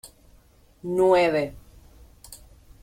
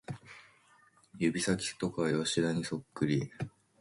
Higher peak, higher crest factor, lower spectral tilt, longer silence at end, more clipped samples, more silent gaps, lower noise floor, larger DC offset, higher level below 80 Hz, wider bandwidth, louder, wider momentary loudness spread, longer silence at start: first, -8 dBFS vs -16 dBFS; about the same, 18 dB vs 18 dB; about the same, -5.5 dB/octave vs -5 dB/octave; about the same, 0.45 s vs 0.35 s; neither; neither; second, -56 dBFS vs -65 dBFS; neither; first, -52 dBFS vs -64 dBFS; first, 16 kHz vs 11.5 kHz; first, -22 LUFS vs -33 LUFS; first, 26 LU vs 16 LU; about the same, 0.05 s vs 0.1 s